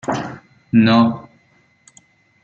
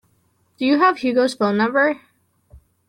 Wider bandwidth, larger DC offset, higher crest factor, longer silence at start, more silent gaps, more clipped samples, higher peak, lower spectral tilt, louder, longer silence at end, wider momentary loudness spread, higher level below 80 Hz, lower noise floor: second, 8.4 kHz vs 12 kHz; neither; about the same, 18 dB vs 16 dB; second, 0.05 s vs 0.6 s; neither; neither; about the same, -2 dBFS vs -4 dBFS; first, -7 dB/octave vs -5.5 dB/octave; about the same, -16 LUFS vs -18 LUFS; first, 1.25 s vs 0.3 s; first, 19 LU vs 6 LU; about the same, -58 dBFS vs -58 dBFS; second, -57 dBFS vs -63 dBFS